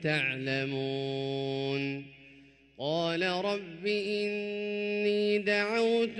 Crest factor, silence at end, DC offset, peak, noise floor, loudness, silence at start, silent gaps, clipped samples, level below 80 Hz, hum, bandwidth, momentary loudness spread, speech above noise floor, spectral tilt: 16 dB; 0 s; under 0.1%; -16 dBFS; -57 dBFS; -31 LUFS; 0 s; none; under 0.1%; -72 dBFS; none; 11 kHz; 7 LU; 27 dB; -5.5 dB/octave